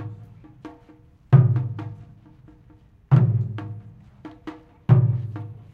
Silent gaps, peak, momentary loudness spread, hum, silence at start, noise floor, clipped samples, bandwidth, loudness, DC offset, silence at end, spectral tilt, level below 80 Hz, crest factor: none; -2 dBFS; 26 LU; none; 0 s; -52 dBFS; under 0.1%; 3.5 kHz; -21 LUFS; under 0.1%; 0.2 s; -11 dB/octave; -52 dBFS; 20 dB